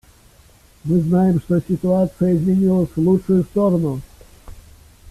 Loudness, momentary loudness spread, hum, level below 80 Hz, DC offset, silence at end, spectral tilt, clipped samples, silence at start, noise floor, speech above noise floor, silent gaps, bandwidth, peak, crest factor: -18 LUFS; 5 LU; none; -44 dBFS; under 0.1%; 0 s; -10 dB/octave; under 0.1%; 0.85 s; -50 dBFS; 33 dB; none; 13 kHz; -6 dBFS; 14 dB